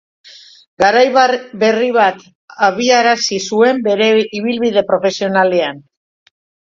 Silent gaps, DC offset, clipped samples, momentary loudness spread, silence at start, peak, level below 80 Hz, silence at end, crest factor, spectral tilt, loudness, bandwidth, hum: 2.35-2.48 s; under 0.1%; under 0.1%; 5 LU; 0.8 s; 0 dBFS; -58 dBFS; 0.95 s; 14 dB; -3.5 dB/octave; -13 LUFS; 7.6 kHz; none